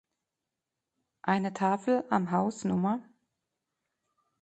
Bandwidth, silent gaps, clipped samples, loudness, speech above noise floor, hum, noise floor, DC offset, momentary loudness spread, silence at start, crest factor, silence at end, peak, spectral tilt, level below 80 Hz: 8.8 kHz; none; under 0.1%; -30 LUFS; 59 dB; none; -88 dBFS; under 0.1%; 4 LU; 1.25 s; 22 dB; 1.4 s; -12 dBFS; -7 dB/octave; -72 dBFS